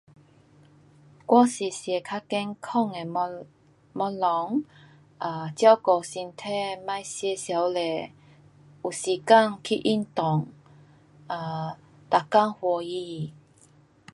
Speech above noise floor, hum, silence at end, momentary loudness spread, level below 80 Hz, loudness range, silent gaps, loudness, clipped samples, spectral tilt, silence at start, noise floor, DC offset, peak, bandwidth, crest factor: 33 dB; none; 0.8 s; 16 LU; -72 dBFS; 4 LU; none; -26 LUFS; under 0.1%; -5 dB/octave; 1.3 s; -58 dBFS; under 0.1%; -4 dBFS; 11.5 kHz; 22 dB